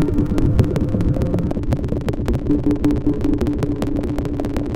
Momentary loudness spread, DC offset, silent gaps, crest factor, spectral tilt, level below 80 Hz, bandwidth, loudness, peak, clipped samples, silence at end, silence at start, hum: 5 LU; under 0.1%; none; 16 dB; -9 dB/octave; -24 dBFS; 15.5 kHz; -20 LUFS; -2 dBFS; under 0.1%; 0 s; 0 s; none